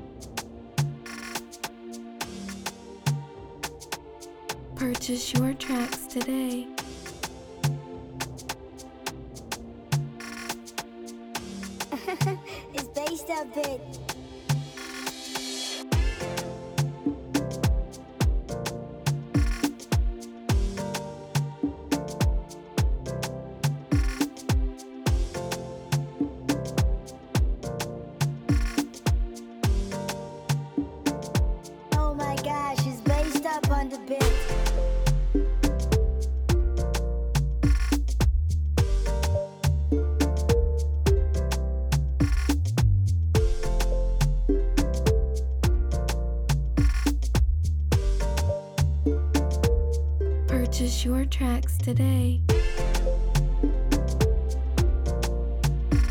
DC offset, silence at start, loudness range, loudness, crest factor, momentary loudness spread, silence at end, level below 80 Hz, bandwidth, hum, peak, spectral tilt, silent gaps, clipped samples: under 0.1%; 0 s; 8 LU; -28 LUFS; 16 dB; 12 LU; 0 s; -28 dBFS; 18.5 kHz; none; -8 dBFS; -5.5 dB/octave; none; under 0.1%